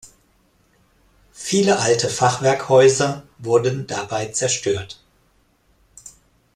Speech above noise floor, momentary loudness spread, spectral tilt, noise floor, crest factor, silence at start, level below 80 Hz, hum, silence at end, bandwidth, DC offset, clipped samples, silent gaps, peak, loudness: 42 dB; 13 LU; -4 dB/octave; -60 dBFS; 18 dB; 1.35 s; -56 dBFS; none; 0.45 s; 13.5 kHz; under 0.1%; under 0.1%; none; -2 dBFS; -19 LUFS